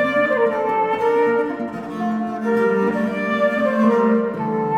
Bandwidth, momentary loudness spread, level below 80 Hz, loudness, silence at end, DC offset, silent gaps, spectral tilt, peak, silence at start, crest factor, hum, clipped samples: 9.2 kHz; 7 LU; -60 dBFS; -19 LUFS; 0 s; under 0.1%; none; -7.5 dB/octave; -6 dBFS; 0 s; 14 dB; none; under 0.1%